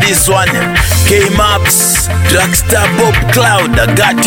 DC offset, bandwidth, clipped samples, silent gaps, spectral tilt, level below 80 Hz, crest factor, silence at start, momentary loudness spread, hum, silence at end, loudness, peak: under 0.1%; 17.5 kHz; under 0.1%; none; -3.5 dB/octave; -20 dBFS; 10 dB; 0 s; 2 LU; none; 0 s; -8 LUFS; 0 dBFS